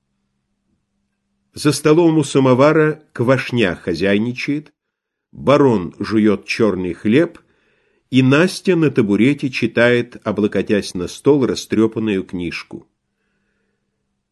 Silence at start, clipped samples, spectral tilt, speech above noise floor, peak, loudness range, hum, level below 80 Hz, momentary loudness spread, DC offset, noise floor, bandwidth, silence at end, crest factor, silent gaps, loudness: 1.55 s; under 0.1%; -6 dB/octave; 62 dB; 0 dBFS; 4 LU; none; -50 dBFS; 10 LU; under 0.1%; -78 dBFS; 12.5 kHz; 1.5 s; 16 dB; none; -16 LUFS